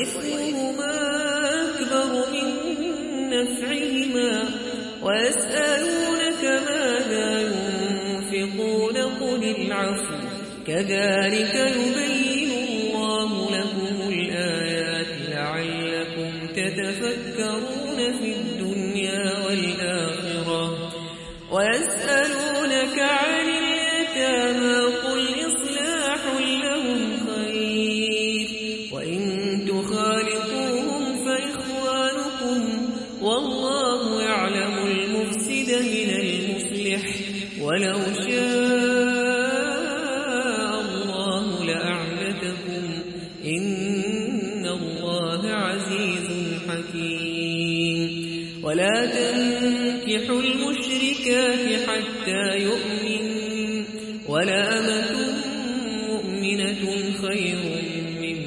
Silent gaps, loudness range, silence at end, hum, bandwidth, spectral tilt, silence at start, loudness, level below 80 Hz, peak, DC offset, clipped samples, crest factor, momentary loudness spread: none; 4 LU; 0 s; none; 11.5 kHz; -3.5 dB/octave; 0 s; -24 LUFS; -58 dBFS; -8 dBFS; under 0.1%; under 0.1%; 16 dB; 7 LU